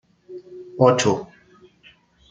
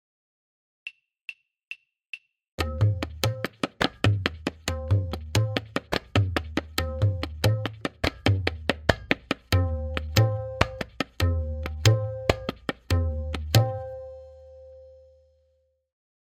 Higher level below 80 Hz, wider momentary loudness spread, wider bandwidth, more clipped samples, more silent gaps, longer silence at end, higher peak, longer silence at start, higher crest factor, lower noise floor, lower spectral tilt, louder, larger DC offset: second, -60 dBFS vs -42 dBFS; first, 25 LU vs 18 LU; second, 9.4 kHz vs 16 kHz; neither; second, none vs 1.67-1.71 s, 2.52-2.58 s; second, 1.05 s vs 1.35 s; about the same, -2 dBFS vs 0 dBFS; second, 0.3 s vs 0.85 s; second, 22 dB vs 28 dB; second, -54 dBFS vs -69 dBFS; about the same, -5 dB/octave vs -5.5 dB/octave; first, -19 LUFS vs -27 LUFS; neither